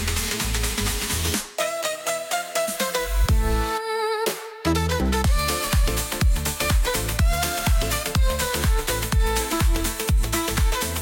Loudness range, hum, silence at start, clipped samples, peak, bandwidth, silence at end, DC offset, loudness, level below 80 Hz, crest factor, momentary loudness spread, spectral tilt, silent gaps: 2 LU; none; 0 s; under 0.1%; -8 dBFS; 17.5 kHz; 0 s; under 0.1%; -23 LUFS; -24 dBFS; 14 dB; 3 LU; -3.5 dB/octave; none